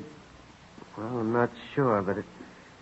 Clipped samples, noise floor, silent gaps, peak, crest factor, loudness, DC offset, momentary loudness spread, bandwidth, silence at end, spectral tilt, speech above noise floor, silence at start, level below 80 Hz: under 0.1%; -52 dBFS; none; -12 dBFS; 20 dB; -29 LUFS; under 0.1%; 22 LU; 8.2 kHz; 0.15 s; -8 dB/octave; 24 dB; 0 s; -64 dBFS